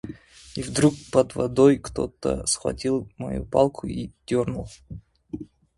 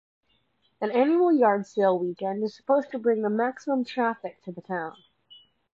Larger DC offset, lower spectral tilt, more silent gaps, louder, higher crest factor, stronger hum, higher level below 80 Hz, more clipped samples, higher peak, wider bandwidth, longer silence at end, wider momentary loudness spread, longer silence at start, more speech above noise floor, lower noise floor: neither; second, -5.5 dB/octave vs -7 dB/octave; neither; about the same, -24 LUFS vs -25 LUFS; about the same, 20 dB vs 18 dB; neither; first, -46 dBFS vs -80 dBFS; neither; first, -4 dBFS vs -10 dBFS; first, 11.5 kHz vs 7.6 kHz; second, 0.35 s vs 0.85 s; first, 21 LU vs 13 LU; second, 0.05 s vs 0.8 s; second, 19 dB vs 45 dB; second, -42 dBFS vs -70 dBFS